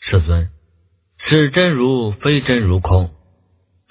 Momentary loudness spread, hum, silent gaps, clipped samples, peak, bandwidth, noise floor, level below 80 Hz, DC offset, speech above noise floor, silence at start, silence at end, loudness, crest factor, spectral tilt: 9 LU; none; none; under 0.1%; 0 dBFS; 4 kHz; -59 dBFS; -26 dBFS; under 0.1%; 44 dB; 0 s; 0.8 s; -16 LUFS; 16 dB; -11 dB/octave